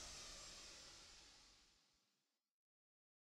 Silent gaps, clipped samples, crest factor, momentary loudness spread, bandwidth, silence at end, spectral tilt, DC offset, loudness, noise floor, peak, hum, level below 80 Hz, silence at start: none; under 0.1%; 18 dB; 12 LU; 15.5 kHz; 1.35 s; -0.5 dB/octave; under 0.1%; -57 LUFS; -90 dBFS; -44 dBFS; none; -74 dBFS; 0 s